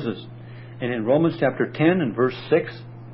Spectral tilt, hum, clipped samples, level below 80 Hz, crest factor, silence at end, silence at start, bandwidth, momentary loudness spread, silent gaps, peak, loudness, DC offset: -11.5 dB/octave; none; under 0.1%; -60 dBFS; 16 dB; 0 s; 0 s; 5.8 kHz; 20 LU; none; -6 dBFS; -22 LUFS; under 0.1%